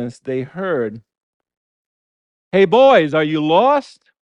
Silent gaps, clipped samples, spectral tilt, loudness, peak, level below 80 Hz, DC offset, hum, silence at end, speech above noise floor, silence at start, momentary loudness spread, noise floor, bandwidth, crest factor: 1.23-1.40 s, 1.57-2.51 s; under 0.1%; -6.5 dB/octave; -15 LUFS; -2 dBFS; -62 dBFS; under 0.1%; none; 0.4 s; over 75 dB; 0 s; 14 LU; under -90 dBFS; 9.2 kHz; 16 dB